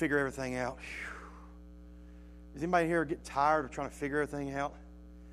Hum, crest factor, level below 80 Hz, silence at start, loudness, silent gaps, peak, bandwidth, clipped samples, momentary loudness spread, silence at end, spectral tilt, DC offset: none; 22 dB; -52 dBFS; 0 s; -34 LUFS; none; -14 dBFS; 14.5 kHz; under 0.1%; 24 LU; 0 s; -6 dB/octave; under 0.1%